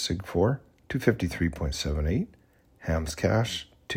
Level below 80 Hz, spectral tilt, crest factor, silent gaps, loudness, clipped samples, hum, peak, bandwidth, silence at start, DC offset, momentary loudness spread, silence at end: -38 dBFS; -5.5 dB/octave; 22 dB; none; -29 LUFS; under 0.1%; none; -8 dBFS; 16 kHz; 0 s; under 0.1%; 9 LU; 0 s